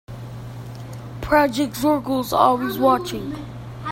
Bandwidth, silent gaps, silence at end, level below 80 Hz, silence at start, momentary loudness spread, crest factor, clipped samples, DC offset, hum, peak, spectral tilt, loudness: 16.5 kHz; none; 0 s; -44 dBFS; 0.1 s; 17 LU; 20 dB; under 0.1%; under 0.1%; none; -2 dBFS; -5.5 dB/octave; -20 LUFS